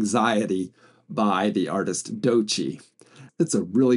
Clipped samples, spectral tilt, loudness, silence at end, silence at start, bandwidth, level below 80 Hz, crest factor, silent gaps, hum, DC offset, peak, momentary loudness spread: under 0.1%; -4.5 dB/octave; -24 LUFS; 0 s; 0 s; 11.5 kHz; -74 dBFS; 16 dB; none; none; under 0.1%; -8 dBFS; 11 LU